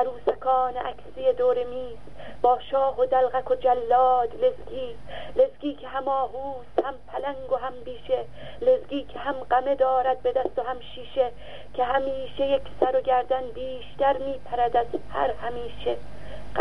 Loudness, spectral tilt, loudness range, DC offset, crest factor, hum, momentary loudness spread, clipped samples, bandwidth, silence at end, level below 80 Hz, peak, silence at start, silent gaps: -26 LUFS; -6.5 dB/octave; 5 LU; 1%; 20 dB; 50 Hz at -50 dBFS; 13 LU; under 0.1%; 5.6 kHz; 0 s; -50 dBFS; -6 dBFS; 0 s; none